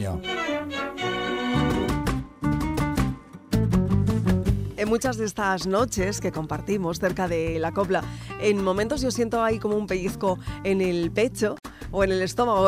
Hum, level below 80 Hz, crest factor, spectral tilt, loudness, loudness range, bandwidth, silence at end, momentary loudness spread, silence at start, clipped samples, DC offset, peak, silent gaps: none; -38 dBFS; 18 dB; -5.5 dB/octave; -25 LUFS; 1 LU; 16 kHz; 0 s; 6 LU; 0 s; under 0.1%; under 0.1%; -8 dBFS; none